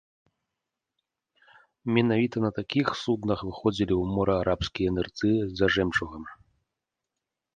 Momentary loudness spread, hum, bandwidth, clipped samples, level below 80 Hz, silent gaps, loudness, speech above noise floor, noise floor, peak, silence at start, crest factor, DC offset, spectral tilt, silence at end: 6 LU; none; 9.2 kHz; under 0.1%; -48 dBFS; none; -27 LUFS; 60 dB; -86 dBFS; -6 dBFS; 1.85 s; 22 dB; under 0.1%; -6.5 dB/octave; 1.2 s